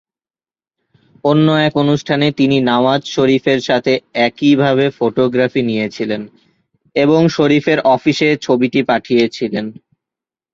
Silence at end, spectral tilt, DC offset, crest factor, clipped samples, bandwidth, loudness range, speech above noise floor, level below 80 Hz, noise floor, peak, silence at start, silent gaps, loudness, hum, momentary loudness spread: 0.8 s; -6.5 dB/octave; under 0.1%; 14 dB; under 0.1%; 7.6 kHz; 2 LU; over 76 dB; -54 dBFS; under -90 dBFS; 0 dBFS; 1.25 s; none; -14 LUFS; none; 8 LU